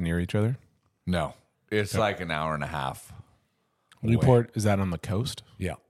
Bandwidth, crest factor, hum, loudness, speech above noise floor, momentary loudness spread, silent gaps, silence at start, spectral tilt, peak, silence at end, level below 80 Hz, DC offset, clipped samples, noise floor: 14.5 kHz; 22 dB; none; -28 LUFS; 46 dB; 13 LU; none; 0 s; -6.5 dB/octave; -6 dBFS; 0.15 s; -48 dBFS; under 0.1%; under 0.1%; -73 dBFS